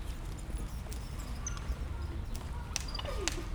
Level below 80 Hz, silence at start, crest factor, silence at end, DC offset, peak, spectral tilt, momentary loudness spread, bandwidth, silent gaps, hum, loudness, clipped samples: -40 dBFS; 0 s; 26 dB; 0 s; under 0.1%; -12 dBFS; -3.5 dB/octave; 6 LU; over 20 kHz; none; none; -40 LUFS; under 0.1%